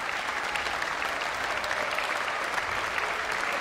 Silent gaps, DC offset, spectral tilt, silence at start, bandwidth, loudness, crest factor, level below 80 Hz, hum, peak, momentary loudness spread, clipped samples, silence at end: none; under 0.1%; -1.5 dB/octave; 0 s; 16 kHz; -29 LUFS; 18 dB; -56 dBFS; none; -12 dBFS; 1 LU; under 0.1%; 0 s